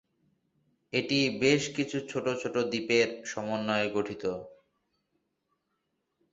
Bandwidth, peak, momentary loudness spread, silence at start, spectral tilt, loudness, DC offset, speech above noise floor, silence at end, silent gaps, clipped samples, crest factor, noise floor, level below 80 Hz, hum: 8 kHz; -10 dBFS; 9 LU; 0.95 s; -4.5 dB/octave; -29 LUFS; under 0.1%; 50 dB; 1.8 s; none; under 0.1%; 22 dB; -80 dBFS; -68 dBFS; none